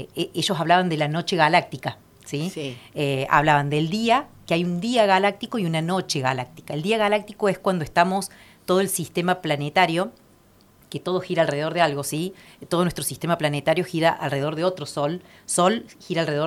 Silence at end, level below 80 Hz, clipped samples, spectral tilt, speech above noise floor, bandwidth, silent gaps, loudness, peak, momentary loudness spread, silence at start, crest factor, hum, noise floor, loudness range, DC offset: 0 s; -56 dBFS; under 0.1%; -4.5 dB/octave; 32 dB; 16 kHz; none; -23 LUFS; -2 dBFS; 11 LU; 0 s; 22 dB; none; -55 dBFS; 3 LU; under 0.1%